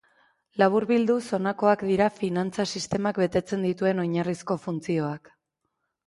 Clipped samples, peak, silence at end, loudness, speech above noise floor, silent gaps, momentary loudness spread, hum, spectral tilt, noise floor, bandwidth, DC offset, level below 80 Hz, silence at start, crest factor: under 0.1%; -8 dBFS; 0.9 s; -26 LUFS; 54 dB; none; 7 LU; none; -6 dB/octave; -79 dBFS; 11.5 kHz; under 0.1%; -60 dBFS; 0.55 s; 18 dB